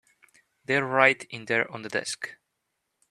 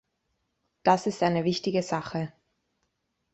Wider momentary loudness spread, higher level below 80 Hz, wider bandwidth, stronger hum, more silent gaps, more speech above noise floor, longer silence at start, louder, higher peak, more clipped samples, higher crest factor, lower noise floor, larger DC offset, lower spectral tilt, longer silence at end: first, 15 LU vs 10 LU; second, -74 dBFS vs -66 dBFS; first, 13.5 kHz vs 8.4 kHz; neither; neither; about the same, 53 dB vs 51 dB; second, 0.7 s vs 0.85 s; about the same, -25 LUFS vs -27 LUFS; first, -4 dBFS vs -8 dBFS; neither; about the same, 26 dB vs 22 dB; about the same, -80 dBFS vs -77 dBFS; neither; second, -3.5 dB/octave vs -5.5 dB/octave; second, 0.75 s vs 1.05 s